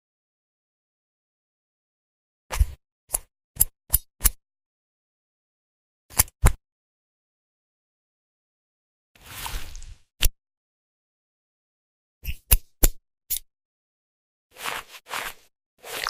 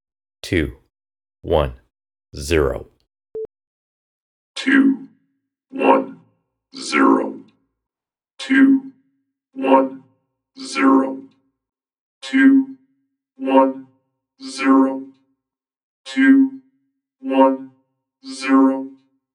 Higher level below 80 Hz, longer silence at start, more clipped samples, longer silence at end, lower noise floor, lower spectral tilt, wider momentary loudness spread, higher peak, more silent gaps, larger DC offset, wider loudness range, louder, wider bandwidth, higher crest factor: first, -32 dBFS vs -42 dBFS; first, 2.5 s vs 0.45 s; neither; second, 0 s vs 0.45 s; about the same, under -90 dBFS vs under -90 dBFS; second, -2 dB/octave vs -5.5 dB/octave; second, 17 LU vs 21 LU; about the same, 0 dBFS vs 0 dBFS; first, 2.92-3.08 s, 3.44-3.55 s, 4.66-6.09 s, 6.72-9.15 s, 10.57-12.21 s, 13.65-14.50 s, 15.66-15.77 s vs 3.67-4.54 s, 11.99-12.21 s, 15.83-16.04 s; neither; about the same, 8 LU vs 6 LU; second, -26 LUFS vs -17 LUFS; first, 16 kHz vs 11.5 kHz; first, 30 dB vs 20 dB